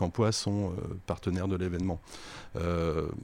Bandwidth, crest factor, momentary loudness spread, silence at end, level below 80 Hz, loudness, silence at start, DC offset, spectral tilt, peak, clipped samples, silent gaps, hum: 15.5 kHz; 16 dB; 12 LU; 0 s; -48 dBFS; -32 LUFS; 0 s; under 0.1%; -6 dB/octave; -16 dBFS; under 0.1%; none; none